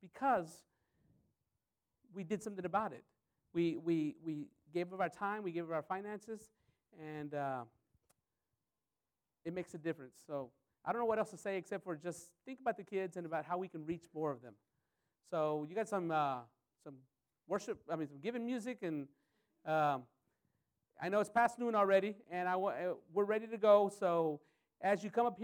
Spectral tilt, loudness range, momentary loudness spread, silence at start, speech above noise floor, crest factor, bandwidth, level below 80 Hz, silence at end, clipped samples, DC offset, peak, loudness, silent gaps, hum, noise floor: -6 dB/octave; 11 LU; 15 LU; 0.05 s; over 52 dB; 22 dB; 16.5 kHz; -82 dBFS; 0 s; under 0.1%; under 0.1%; -16 dBFS; -38 LUFS; none; none; under -90 dBFS